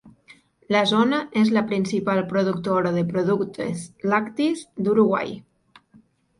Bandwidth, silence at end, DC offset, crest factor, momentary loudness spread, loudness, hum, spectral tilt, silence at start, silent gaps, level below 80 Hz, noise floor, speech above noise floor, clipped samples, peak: 11 kHz; 1 s; under 0.1%; 16 dB; 8 LU; -22 LUFS; none; -6 dB/octave; 0.05 s; none; -62 dBFS; -56 dBFS; 35 dB; under 0.1%; -6 dBFS